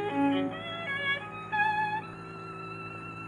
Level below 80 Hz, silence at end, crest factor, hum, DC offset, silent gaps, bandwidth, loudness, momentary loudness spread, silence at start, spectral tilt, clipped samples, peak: -66 dBFS; 0 s; 16 dB; none; under 0.1%; none; 10 kHz; -31 LUFS; 13 LU; 0 s; -6 dB/octave; under 0.1%; -16 dBFS